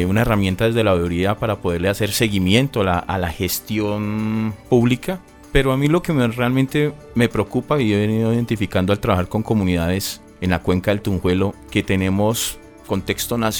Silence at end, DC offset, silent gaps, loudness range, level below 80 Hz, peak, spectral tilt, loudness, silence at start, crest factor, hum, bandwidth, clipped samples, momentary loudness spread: 0 s; under 0.1%; none; 2 LU; -36 dBFS; 0 dBFS; -5.5 dB/octave; -19 LUFS; 0 s; 18 dB; none; over 20 kHz; under 0.1%; 6 LU